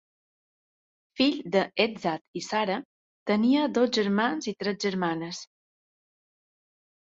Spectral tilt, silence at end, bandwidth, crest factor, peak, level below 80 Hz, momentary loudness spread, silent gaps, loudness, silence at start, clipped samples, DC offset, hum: -5 dB/octave; 1.65 s; 7.8 kHz; 20 dB; -10 dBFS; -72 dBFS; 11 LU; 2.21-2.34 s, 2.85-3.26 s; -27 LUFS; 1.15 s; under 0.1%; under 0.1%; none